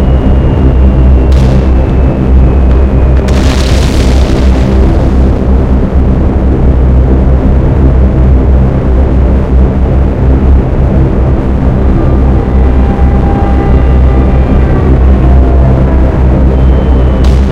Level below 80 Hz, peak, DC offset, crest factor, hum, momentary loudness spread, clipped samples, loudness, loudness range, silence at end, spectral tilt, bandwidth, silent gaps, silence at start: -6 dBFS; 0 dBFS; under 0.1%; 6 dB; none; 2 LU; 5%; -8 LUFS; 1 LU; 0 s; -8.5 dB/octave; 7.4 kHz; none; 0 s